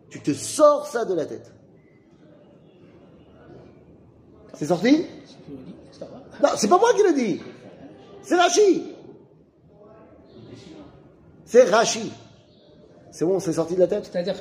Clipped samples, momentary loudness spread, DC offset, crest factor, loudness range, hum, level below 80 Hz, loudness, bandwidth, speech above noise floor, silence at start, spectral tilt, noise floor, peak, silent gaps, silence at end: under 0.1%; 25 LU; under 0.1%; 20 dB; 7 LU; none; -64 dBFS; -21 LUFS; 15.5 kHz; 33 dB; 0.1 s; -4 dB/octave; -54 dBFS; -4 dBFS; none; 0 s